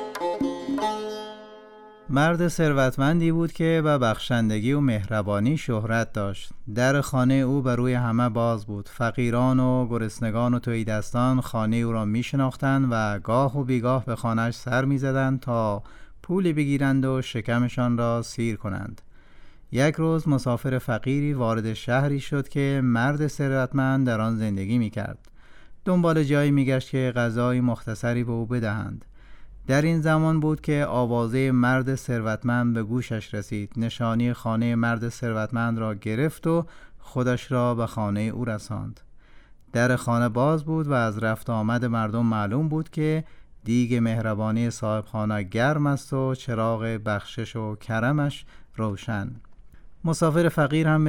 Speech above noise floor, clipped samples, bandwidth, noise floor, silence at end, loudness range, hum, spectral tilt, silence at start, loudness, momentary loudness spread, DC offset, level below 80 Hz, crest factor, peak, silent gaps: 25 dB; under 0.1%; 16 kHz; -48 dBFS; 0 s; 3 LU; none; -7 dB/octave; 0 s; -25 LUFS; 9 LU; under 0.1%; -48 dBFS; 14 dB; -10 dBFS; none